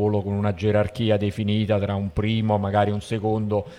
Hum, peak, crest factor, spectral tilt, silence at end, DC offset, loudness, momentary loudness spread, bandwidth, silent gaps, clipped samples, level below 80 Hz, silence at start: none; -8 dBFS; 14 dB; -8 dB/octave; 0 s; under 0.1%; -23 LUFS; 3 LU; 11 kHz; none; under 0.1%; -46 dBFS; 0 s